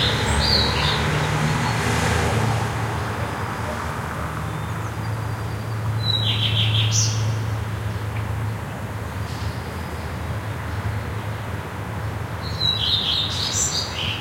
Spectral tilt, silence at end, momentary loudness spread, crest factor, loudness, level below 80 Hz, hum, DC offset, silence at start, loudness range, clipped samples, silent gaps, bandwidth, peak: -3.5 dB/octave; 0 s; 11 LU; 18 dB; -23 LUFS; -38 dBFS; none; under 0.1%; 0 s; 7 LU; under 0.1%; none; 16.5 kHz; -6 dBFS